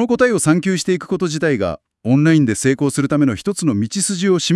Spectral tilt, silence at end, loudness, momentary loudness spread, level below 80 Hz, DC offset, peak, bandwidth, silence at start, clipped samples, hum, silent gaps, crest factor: -5 dB/octave; 0 s; -17 LUFS; 6 LU; -52 dBFS; under 0.1%; 0 dBFS; 12 kHz; 0 s; under 0.1%; none; none; 16 dB